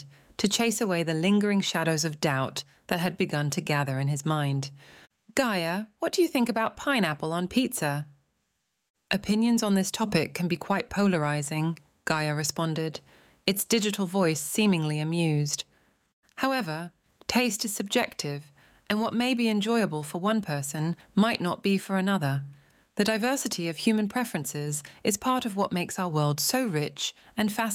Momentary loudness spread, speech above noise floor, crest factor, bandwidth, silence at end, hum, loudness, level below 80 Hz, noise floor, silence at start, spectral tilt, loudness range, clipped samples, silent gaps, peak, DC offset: 8 LU; 50 dB; 22 dB; 17 kHz; 0 s; none; -27 LUFS; -64 dBFS; -77 dBFS; 0 s; -4.5 dB/octave; 2 LU; under 0.1%; 8.90-8.94 s, 16.13-16.23 s; -6 dBFS; under 0.1%